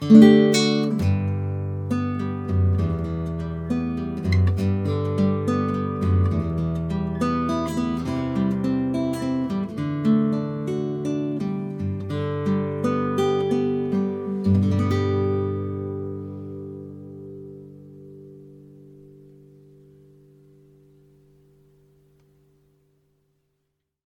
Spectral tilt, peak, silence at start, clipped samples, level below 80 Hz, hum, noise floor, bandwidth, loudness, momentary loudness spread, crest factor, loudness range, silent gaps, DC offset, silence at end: -7.5 dB/octave; 0 dBFS; 0 s; under 0.1%; -46 dBFS; none; -77 dBFS; 12 kHz; -23 LUFS; 15 LU; 22 dB; 12 LU; none; under 0.1%; 5.5 s